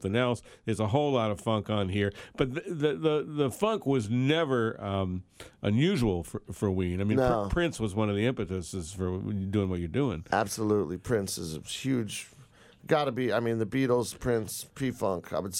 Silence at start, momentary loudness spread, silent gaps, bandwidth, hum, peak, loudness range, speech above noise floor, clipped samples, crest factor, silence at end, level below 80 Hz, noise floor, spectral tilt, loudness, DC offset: 0 s; 8 LU; none; 16 kHz; none; -10 dBFS; 2 LU; 27 dB; under 0.1%; 20 dB; 0 s; -50 dBFS; -56 dBFS; -6 dB/octave; -30 LUFS; under 0.1%